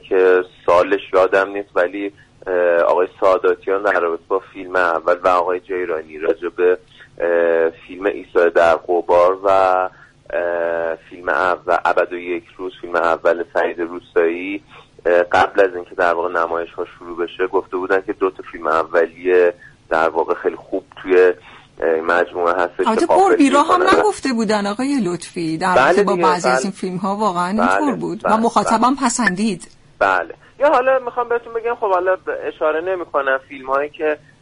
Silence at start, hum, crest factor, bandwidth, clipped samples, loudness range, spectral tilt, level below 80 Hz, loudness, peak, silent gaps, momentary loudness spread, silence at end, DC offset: 0.05 s; none; 14 dB; 11 kHz; under 0.1%; 4 LU; -4.5 dB/octave; -52 dBFS; -17 LUFS; -2 dBFS; none; 10 LU; 0.25 s; under 0.1%